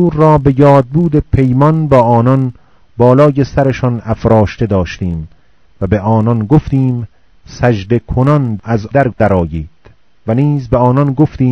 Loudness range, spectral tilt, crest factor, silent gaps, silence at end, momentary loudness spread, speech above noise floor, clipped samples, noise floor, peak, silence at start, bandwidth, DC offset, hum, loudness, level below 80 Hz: 4 LU; -9.5 dB/octave; 12 dB; none; 0 s; 12 LU; 36 dB; 1%; -46 dBFS; 0 dBFS; 0 s; 6.6 kHz; 0.6%; none; -11 LUFS; -30 dBFS